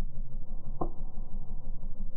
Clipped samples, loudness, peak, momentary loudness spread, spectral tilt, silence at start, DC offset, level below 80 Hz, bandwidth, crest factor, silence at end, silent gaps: under 0.1%; -43 LUFS; -16 dBFS; 6 LU; -13.5 dB/octave; 0 s; under 0.1%; -32 dBFS; 1.3 kHz; 12 dB; 0 s; none